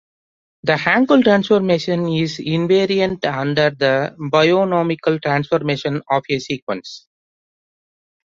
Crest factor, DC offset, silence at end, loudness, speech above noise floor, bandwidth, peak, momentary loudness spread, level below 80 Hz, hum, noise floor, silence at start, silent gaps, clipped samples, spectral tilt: 18 dB; under 0.1%; 1.3 s; -17 LUFS; over 73 dB; 7.6 kHz; 0 dBFS; 9 LU; -56 dBFS; none; under -90 dBFS; 0.65 s; 6.62-6.67 s; under 0.1%; -6.5 dB/octave